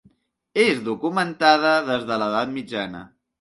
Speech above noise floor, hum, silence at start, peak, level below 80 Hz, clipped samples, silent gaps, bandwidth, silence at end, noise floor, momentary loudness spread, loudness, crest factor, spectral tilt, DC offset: 39 dB; none; 0.55 s; -2 dBFS; -64 dBFS; under 0.1%; none; 11.5 kHz; 0.35 s; -60 dBFS; 12 LU; -21 LUFS; 20 dB; -4.5 dB/octave; under 0.1%